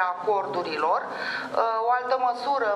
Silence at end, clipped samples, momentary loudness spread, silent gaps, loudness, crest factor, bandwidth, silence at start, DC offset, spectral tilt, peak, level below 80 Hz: 0 s; under 0.1%; 5 LU; none; -26 LUFS; 16 dB; 11.5 kHz; 0 s; under 0.1%; -4 dB/octave; -8 dBFS; -76 dBFS